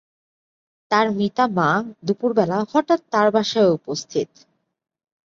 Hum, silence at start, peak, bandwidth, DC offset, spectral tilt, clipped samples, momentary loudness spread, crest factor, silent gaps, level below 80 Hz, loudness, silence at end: none; 0.9 s; -2 dBFS; 7.6 kHz; under 0.1%; -5.5 dB/octave; under 0.1%; 8 LU; 18 dB; none; -64 dBFS; -20 LUFS; 1 s